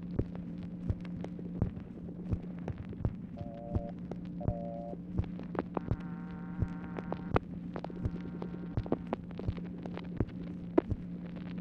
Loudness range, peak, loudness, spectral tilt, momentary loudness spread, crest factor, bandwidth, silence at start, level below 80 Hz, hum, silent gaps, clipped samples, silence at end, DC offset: 2 LU; -12 dBFS; -39 LUFS; -10 dB/octave; 7 LU; 26 dB; 6 kHz; 0 s; -48 dBFS; none; none; under 0.1%; 0 s; under 0.1%